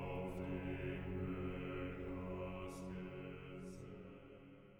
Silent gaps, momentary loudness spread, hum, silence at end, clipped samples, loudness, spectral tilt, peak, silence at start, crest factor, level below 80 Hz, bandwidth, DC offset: none; 11 LU; none; 0 s; under 0.1%; -47 LUFS; -7.5 dB/octave; -32 dBFS; 0 s; 14 dB; -58 dBFS; 19 kHz; under 0.1%